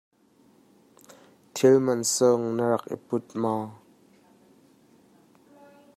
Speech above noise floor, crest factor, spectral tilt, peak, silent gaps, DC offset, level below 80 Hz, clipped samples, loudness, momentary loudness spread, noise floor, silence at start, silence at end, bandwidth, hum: 37 dB; 20 dB; -4.5 dB/octave; -6 dBFS; none; under 0.1%; -74 dBFS; under 0.1%; -24 LUFS; 12 LU; -60 dBFS; 1.55 s; 2.2 s; 15.5 kHz; none